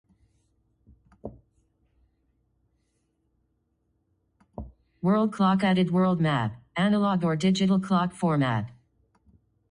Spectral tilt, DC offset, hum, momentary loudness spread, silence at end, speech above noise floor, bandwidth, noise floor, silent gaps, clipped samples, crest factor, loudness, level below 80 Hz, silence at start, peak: -7 dB/octave; under 0.1%; none; 21 LU; 1 s; 50 dB; 10.5 kHz; -73 dBFS; none; under 0.1%; 16 dB; -25 LUFS; -56 dBFS; 1.25 s; -12 dBFS